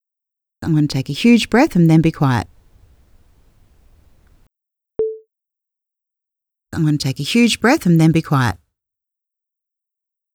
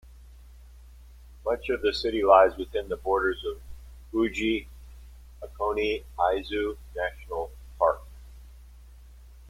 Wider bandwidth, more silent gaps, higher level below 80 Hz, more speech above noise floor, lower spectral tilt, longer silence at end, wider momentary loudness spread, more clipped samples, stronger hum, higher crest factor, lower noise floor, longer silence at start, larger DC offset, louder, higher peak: first, 18 kHz vs 16 kHz; neither; about the same, -46 dBFS vs -46 dBFS; first, 70 dB vs 23 dB; about the same, -6 dB/octave vs -5.5 dB/octave; first, 1.8 s vs 0 s; about the same, 16 LU vs 16 LU; neither; neither; second, 18 dB vs 24 dB; first, -84 dBFS vs -49 dBFS; first, 0.6 s vs 0.05 s; neither; first, -16 LUFS vs -27 LUFS; first, 0 dBFS vs -4 dBFS